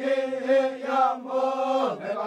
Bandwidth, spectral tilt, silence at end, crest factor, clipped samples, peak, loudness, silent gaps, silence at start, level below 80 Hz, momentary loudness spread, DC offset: 9.2 kHz; -5 dB/octave; 0 s; 14 dB; under 0.1%; -10 dBFS; -25 LUFS; none; 0 s; -82 dBFS; 3 LU; under 0.1%